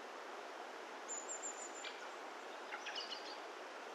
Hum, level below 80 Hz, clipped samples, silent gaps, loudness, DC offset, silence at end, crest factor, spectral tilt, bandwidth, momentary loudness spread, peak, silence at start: none; under -90 dBFS; under 0.1%; none; -47 LUFS; under 0.1%; 0 s; 16 dB; 1 dB/octave; 14.5 kHz; 5 LU; -32 dBFS; 0 s